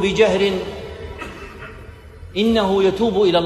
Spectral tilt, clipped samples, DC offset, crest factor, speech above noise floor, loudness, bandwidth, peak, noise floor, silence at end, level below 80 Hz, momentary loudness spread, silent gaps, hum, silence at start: -5.5 dB/octave; under 0.1%; under 0.1%; 16 dB; 22 dB; -18 LUFS; 13 kHz; -2 dBFS; -38 dBFS; 0 s; -40 dBFS; 20 LU; none; none; 0 s